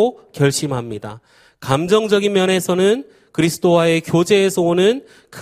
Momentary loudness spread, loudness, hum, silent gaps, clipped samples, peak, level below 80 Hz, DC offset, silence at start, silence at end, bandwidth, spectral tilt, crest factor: 12 LU; -16 LUFS; none; none; under 0.1%; 0 dBFS; -54 dBFS; under 0.1%; 0 s; 0 s; 15.5 kHz; -5 dB/octave; 16 dB